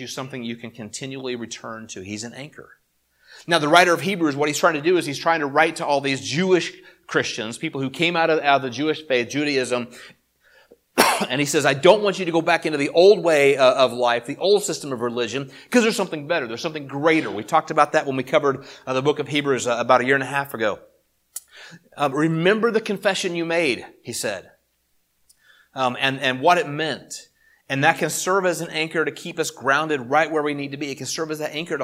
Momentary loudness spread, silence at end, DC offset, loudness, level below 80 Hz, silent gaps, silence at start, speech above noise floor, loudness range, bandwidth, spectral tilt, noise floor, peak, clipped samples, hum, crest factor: 15 LU; 0 s; under 0.1%; -21 LUFS; -68 dBFS; none; 0 s; 46 dB; 6 LU; 16.5 kHz; -4 dB/octave; -68 dBFS; 0 dBFS; under 0.1%; none; 22 dB